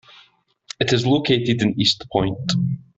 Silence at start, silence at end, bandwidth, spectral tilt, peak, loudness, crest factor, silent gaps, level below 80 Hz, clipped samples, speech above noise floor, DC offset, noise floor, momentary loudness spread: 0.8 s; 0.2 s; 8 kHz; -5.5 dB/octave; -4 dBFS; -20 LUFS; 18 dB; none; -50 dBFS; under 0.1%; 37 dB; under 0.1%; -56 dBFS; 5 LU